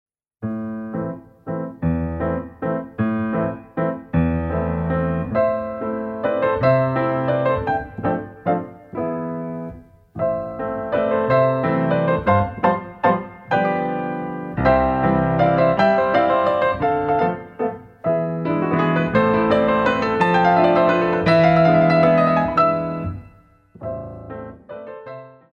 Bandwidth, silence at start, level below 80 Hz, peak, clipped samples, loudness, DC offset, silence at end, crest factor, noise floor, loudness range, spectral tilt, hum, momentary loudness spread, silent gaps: 7 kHz; 0.4 s; -42 dBFS; -2 dBFS; under 0.1%; -20 LUFS; under 0.1%; 0.2 s; 16 dB; -49 dBFS; 9 LU; -9 dB/octave; none; 15 LU; none